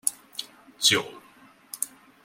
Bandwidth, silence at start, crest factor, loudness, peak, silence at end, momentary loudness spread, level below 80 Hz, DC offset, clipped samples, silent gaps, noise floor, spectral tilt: 16.5 kHz; 0.05 s; 28 dB; -25 LUFS; -2 dBFS; 0.35 s; 21 LU; -70 dBFS; under 0.1%; under 0.1%; none; -55 dBFS; -0.5 dB/octave